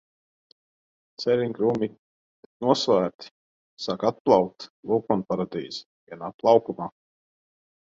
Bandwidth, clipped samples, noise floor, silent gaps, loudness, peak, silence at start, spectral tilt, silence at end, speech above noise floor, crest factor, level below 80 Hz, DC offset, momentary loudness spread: 7.8 kHz; under 0.1%; under -90 dBFS; 1.99-2.60 s, 3.14-3.19 s, 3.31-3.77 s, 4.20-4.25 s, 4.70-4.83 s, 5.86-6.07 s, 6.34-6.39 s; -25 LUFS; -4 dBFS; 1.2 s; -6 dB/octave; 0.95 s; over 66 dB; 24 dB; -66 dBFS; under 0.1%; 17 LU